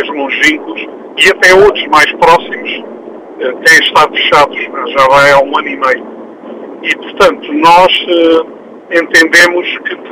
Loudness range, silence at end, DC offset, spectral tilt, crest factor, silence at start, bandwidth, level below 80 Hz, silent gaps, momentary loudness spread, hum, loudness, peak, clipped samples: 2 LU; 0 s; under 0.1%; -2.5 dB/octave; 8 dB; 0 s; 17 kHz; -42 dBFS; none; 17 LU; none; -7 LUFS; 0 dBFS; 0.9%